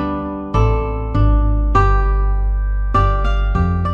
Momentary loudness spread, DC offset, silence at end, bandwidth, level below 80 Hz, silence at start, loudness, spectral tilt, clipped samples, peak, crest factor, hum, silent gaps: 6 LU; under 0.1%; 0 s; 5.6 kHz; -16 dBFS; 0 s; -18 LUFS; -8.5 dB/octave; under 0.1%; -2 dBFS; 14 dB; none; none